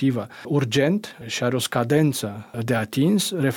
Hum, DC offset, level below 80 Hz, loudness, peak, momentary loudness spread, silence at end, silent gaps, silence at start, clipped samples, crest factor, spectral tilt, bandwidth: none; under 0.1%; -62 dBFS; -23 LUFS; -8 dBFS; 10 LU; 0 s; none; 0 s; under 0.1%; 14 dB; -5.5 dB/octave; 18 kHz